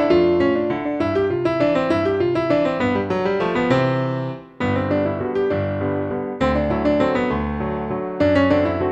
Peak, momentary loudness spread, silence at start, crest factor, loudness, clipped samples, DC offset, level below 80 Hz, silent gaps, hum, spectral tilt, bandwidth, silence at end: -4 dBFS; 7 LU; 0 s; 14 dB; -20 LUFS; under 0.1%; under 0.1%; -40 dBFS; none; none; -8 dB/octave; 8.2 kHz; 0 s